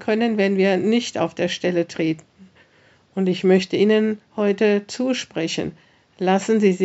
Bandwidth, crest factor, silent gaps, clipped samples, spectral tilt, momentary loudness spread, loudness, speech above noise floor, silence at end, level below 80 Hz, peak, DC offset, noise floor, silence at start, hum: 8 kHz; 18 dB; none; under 0.1%; -5 dB/octave; 8 LU; -20 LUFS; 36 dB; 0 s; -68 dBFS; -4 dBFS; under 0.1%; -56 dBFS; 0 s; none